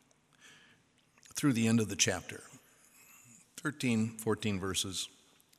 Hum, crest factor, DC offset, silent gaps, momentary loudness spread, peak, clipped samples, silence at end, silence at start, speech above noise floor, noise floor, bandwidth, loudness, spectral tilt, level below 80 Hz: none; 24 dB; under 0.1%; none; 17 LU; -12 dBFS; under 0.1%; 0.5 s; 0.45 s; 36 dB; -68 dBFS; 15.5 kHz; -33 LUFS; -4 dB/octave; -68 dBFS